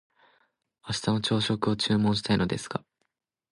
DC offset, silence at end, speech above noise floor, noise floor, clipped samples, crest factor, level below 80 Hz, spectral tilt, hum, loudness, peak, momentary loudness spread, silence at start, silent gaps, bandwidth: under 0.1%; 0.75 s; 53 dB; -79 dBFS; under 0.1%; 20 dB; -54 dBFS; -5.5 dB/octave; none; -27 LUFS; -10 dBFS; 11 LU; 0.85 s; none; 11.5 kHz